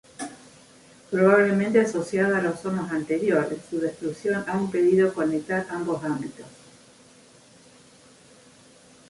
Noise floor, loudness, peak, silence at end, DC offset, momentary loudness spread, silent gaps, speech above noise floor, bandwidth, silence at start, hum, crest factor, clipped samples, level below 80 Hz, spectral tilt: -53 dBFS; -24 LUFS; -4 dBFS; 2.6 s; under 0.1%; 11 LU; none; 30 dB; 11.5 kHz; 0.2 s; none; 20 dB; under 0.1%; -66 dBFS; -6.5 dB/octave